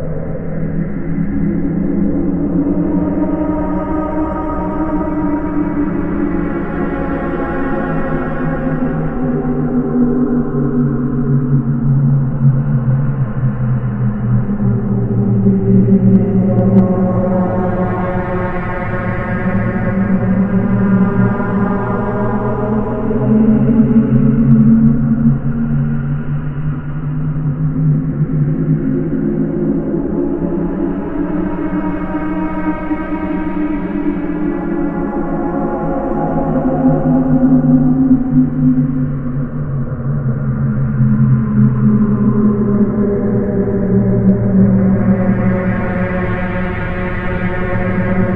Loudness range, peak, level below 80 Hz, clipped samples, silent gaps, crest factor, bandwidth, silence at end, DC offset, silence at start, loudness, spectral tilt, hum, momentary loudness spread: 5 LU; 0 dBFS; -28 dBFS; under 0.1%; none; 14 dB; 3.6 kHz; 0 s; under 0.1%; 0 s; -15 LUFS; -12.5 dB/octave; none; 8 LU